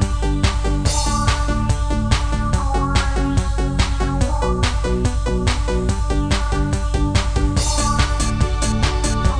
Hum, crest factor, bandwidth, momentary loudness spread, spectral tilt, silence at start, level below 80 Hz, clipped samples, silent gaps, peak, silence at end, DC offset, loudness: none; 16 dB; 10 kHz; 2 LU; -5 dB/octave; 0 s; -20 dBFS; under 0.1%; none; -2 dBFS; 0 s; 1%; -20 LUFS